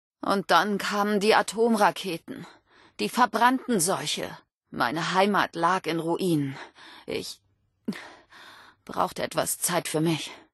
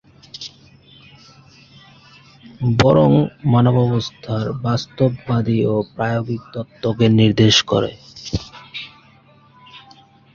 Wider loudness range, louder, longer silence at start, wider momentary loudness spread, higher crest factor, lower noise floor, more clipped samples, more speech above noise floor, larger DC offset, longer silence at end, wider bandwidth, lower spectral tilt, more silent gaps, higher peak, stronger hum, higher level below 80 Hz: first, 8 LU vs 3 LU; second, -25 LUFS vs -17 LUFS; about the same, 0.25 s vs 0.35 s; about the same, 17 LU vs 19 LU; about the same, 20 dB vs 18 dB; about the same, -50 dBFS vs -50 dBFS; neither; second, 25 dB vs 34 dB; neither; second, 0.15 s vs 0.55 s; first, 12.5 kHz vs 7.4 kHz; second, -3.5 dB/octave vs -6 dB/octave; first, 4.55-4.61 s vs none; second, -6 dBFS vs -2 dBFS; neither; second, -68 dBFS vs -44 dBFS